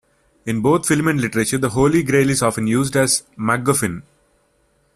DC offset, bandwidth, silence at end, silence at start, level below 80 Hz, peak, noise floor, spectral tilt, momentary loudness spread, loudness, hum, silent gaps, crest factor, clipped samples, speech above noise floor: under 0.1%; 14.5 kHz; 0.95 s; 0.45 s; -46 dBFS; -2 dBFS; -61 dBFS; -4.5 dB/octave; 6 LU; -18 LUFS; none; none; 16 dB; under 0.1%; 44 dB